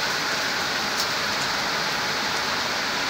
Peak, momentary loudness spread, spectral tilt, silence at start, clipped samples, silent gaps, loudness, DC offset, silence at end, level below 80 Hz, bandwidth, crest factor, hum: -10 dBFS; 1 LU; -1 dB/octave; 0 s; under 0.1%; none; -23 LUFS; under 0.1%; 0 s; -56 dBFS; 16 kHz; 16 dB; none